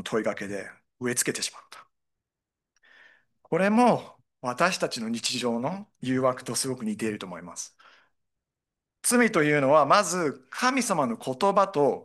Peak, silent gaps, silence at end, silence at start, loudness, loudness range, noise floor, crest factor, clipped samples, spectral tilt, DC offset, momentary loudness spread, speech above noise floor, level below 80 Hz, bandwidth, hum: -6 dBFS; none; 0 s; 0 s; -25 LUFS; 8 LU; -88 dBFS; 20 dB; under 0.1%; -3.5 dB/octave; under 0.1%; 15 LU; 63 dB; -74 dBFS; 12.5 kHz; none